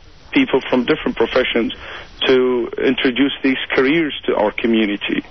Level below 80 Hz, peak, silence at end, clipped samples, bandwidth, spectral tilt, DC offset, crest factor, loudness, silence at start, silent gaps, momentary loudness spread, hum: -46 dBFS; -4 dBFS; 0.05 s; under 0.1%; 6.2 kHz; -6.5 dB/octave; 0.5%; 12 dB; -17 LUFS; 0.3 s; none; 5 LU; none